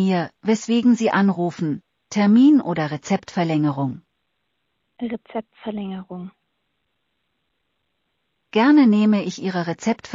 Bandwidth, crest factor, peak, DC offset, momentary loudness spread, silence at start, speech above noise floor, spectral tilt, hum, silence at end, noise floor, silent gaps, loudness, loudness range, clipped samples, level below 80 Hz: 7.6 kHz; 16 dB; -6 dBFS; under 0.1%; 18 LU; 0 s; 55 dB; -6.5 dB/octave; none; 0 s; -74 dBFS; none; -20 LUFS; 15 LU; under 0.1%; -66 dBFS